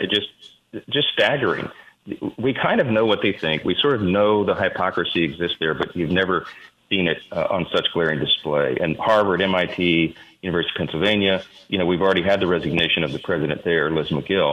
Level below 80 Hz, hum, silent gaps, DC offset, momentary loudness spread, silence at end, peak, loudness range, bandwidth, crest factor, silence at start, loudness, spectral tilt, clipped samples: -52 dBFS; none; none; under 0.1%; 7 LU; 0 s; -6 dBFS; 2 LU; 11 kHz; 16 dB; 0 s; -21 LUFS; -6.5 dB/octave; under 0.1%